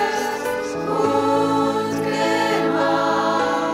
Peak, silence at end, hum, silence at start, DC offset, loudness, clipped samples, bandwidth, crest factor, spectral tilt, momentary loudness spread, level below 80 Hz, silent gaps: -8 dBFS; 0 s; none; 0 s; under 0.1%; -20 LUFS; under 0.1%; 16 kHz; 12 dB; -4.5 dB/octave; 5 LU; -56 dBFS; none